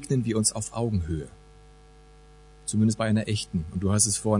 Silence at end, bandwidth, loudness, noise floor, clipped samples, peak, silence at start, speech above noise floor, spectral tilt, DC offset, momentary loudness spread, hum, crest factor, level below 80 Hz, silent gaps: 0 s; 11 kHz; -26 LUFS; -51 dBFS; under 0.1%; -8 dBFS; 0 s; 26 dB; -5 dB/octave; under 0.1%; 11 LU; none; 20 dB; -48 dBFS; none